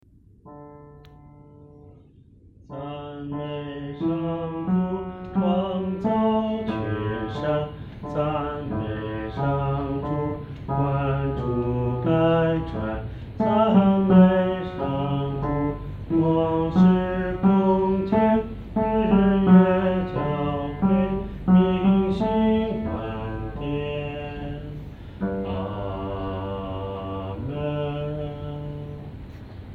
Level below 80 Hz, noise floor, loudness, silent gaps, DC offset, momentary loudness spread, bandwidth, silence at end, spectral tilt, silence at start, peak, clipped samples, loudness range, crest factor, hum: -42 dBFS; -52 dBFS; -24 LUFS; none; under 0.1%; 15 LU; 4.5 kHz; 0 s; -10 dB/octave; 0.45 s; -4 dBFS; under 0.1%; 10 LU; 20 dB; none